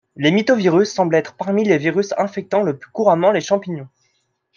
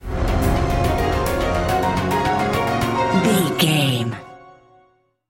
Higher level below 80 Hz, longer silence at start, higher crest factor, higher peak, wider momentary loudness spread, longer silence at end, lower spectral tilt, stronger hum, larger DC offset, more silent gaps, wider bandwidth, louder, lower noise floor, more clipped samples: second, -66 dBFS vs -30 dBFS; first, 0.2 s vs 0.05 s; about the same, 16 dB vs 16 dB; about the same, -2 dBFS vs -4 dBFS; first, 7 LU vs 4 LU; about the same, 0.7 s vs 0.8 s; about the same, -6 dB/octave vs -5.5 dB/octave; neither; neither; neither; second, 7.4 kHz vs 17 kHz; about the same, -17 LUFS vs -19 LUFS; first, -67 dBFS vs -59 dBFS; neither